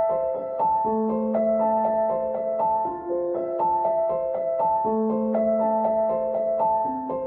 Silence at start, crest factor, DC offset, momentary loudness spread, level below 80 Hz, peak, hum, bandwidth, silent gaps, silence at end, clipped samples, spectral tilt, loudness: 0 s; 12 dB; under 0.1%; 4 LU; -58 dBFS; -12 dBFS; none; 2.8 kHz; none; 0 s; under 0.1%; -12 dB/octave; -24 LUFS